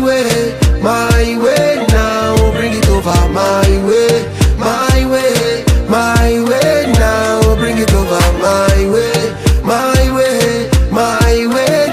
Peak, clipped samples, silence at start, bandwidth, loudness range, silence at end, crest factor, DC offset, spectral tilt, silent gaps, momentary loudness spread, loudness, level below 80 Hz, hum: 0 dBFS; under 0.1%; 0 s; 15.5 kHz; 1 LU; 0 s; 10 dB; 0.2%; -5 dB/octave; none; 2 LU; -12 LUFS; -16 dBFS; none